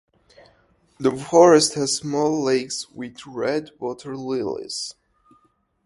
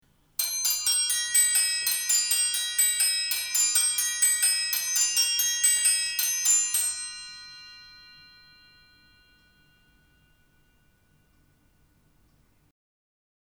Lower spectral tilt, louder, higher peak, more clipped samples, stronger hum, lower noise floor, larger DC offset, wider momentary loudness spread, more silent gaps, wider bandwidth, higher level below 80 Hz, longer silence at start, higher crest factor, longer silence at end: first, -4 dB/octave vs 4.5 dB/octave; about the same, -21 LUFS vs -22 LUFS; first, 0 dBFS vs -8 dBFS; neither; neither; about the same, -63 dBFS vs -64 dBFS; neither; first, 18 LU vs 11 LU; neither; second, 11.5 kHz vs over 20 kHz; first, -62 dBFS vs -68 dBFS; first, 1 s vs 0.4 s; about the same, 22 dB vs 20 dB; second, 0.95 s vs 5.45 s